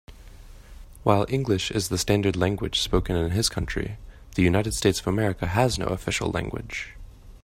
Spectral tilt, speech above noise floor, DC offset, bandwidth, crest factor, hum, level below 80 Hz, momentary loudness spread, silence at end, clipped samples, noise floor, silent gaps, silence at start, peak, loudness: -5 dB/octave; 20 dB; under 0.1%; 16 kHz; 22 dB; none; -40 dBFS; 10 LU; 0.05 s; under 0.1%; -45 dBFS; none; 0.1 s; -2 dBFS; -25 LUFS